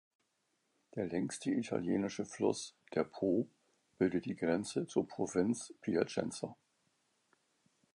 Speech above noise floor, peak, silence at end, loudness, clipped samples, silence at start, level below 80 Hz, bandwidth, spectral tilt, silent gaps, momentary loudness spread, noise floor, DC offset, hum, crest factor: 45 dB; -16 dBFS; 1.4 s; -37 LUFS; under 0.1%; 0.95 s; -70 dBFS; 11.5 kHz; -5.5 dB/octave; none; 7 LU; -81 dBFS; under 0.1%; none; 22 dB